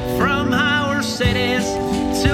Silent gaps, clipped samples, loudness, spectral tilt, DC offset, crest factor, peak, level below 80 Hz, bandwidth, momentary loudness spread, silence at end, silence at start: none; under 0.1%; -18 LUFS; -4.5 dB/octave; under 0.1%; 16 dB; -2 dBFS; -32 dBFS; 17 kHz; 4 LU; 0 s; 0 s